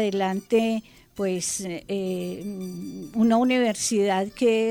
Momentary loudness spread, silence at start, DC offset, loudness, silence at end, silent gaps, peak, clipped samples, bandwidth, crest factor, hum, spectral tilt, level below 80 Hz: 13 LU; 0 s; under 0.1%; -25 LUFS; 0 s; none; -10 dBFS; under 0.1%; 18 kHz; 14 dB; none; -4.5 dB/octave; -60 dBFS